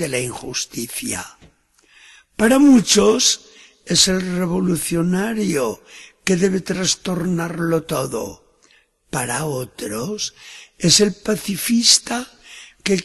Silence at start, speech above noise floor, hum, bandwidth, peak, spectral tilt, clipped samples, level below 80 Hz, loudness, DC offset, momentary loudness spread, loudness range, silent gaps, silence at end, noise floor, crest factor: 0 s; 38 dB; none; 13 kHz; 0 dBFS; -3.5 dB/octave; under 0.1%; -50 dBFS; -18 LUFS; under 0.1%; 15 LU; 8 LU; none; 0 s; -56 dBFS; 20 dB